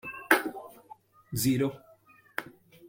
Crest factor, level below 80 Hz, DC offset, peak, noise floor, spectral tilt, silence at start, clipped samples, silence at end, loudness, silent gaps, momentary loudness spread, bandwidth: 28 dB; -64 dBFS; under 0.1%; -4 dBFS; -59 dBFS; -4.5 dB/octave; 0.05 s; under 0.1%; 0 s; -29 LUFS; none; 21 LU; 16.5 kHz